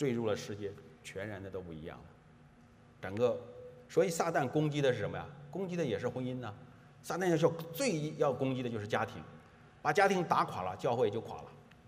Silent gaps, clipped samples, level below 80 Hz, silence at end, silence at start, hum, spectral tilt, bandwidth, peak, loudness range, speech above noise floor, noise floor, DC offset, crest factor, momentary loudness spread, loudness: none; under 0.1%; -70 dBFS; 0.15 s; 0 s; none; -5.5 dB/octave; 15.5 kHz; -14 dBFS; 7 LU; 26 dB; -60 dBFS; under 0.1%; 22 dB; 18 LU; -34 LUFS